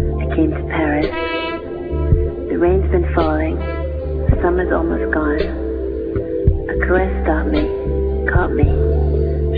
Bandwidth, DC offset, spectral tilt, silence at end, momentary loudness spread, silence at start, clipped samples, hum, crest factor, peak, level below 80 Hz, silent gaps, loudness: 4.9 kHz; under 0.1%; -11 dB/octave; 0 s; 6 LU; 0 s; under 0.1%; none; 16 dB; -2 dBFS; -22 dBFS; none; -18 LUFS